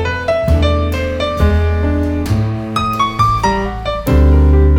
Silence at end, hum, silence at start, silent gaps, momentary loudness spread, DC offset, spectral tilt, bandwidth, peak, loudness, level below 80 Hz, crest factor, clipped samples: 0 s; none; 0 s; none; 7 LU; under 0.1%; -7 dB/octave; 16 kHz; 0 dBFS; -14 LUFS; -16 dBFS; 12 dB; under 0.1%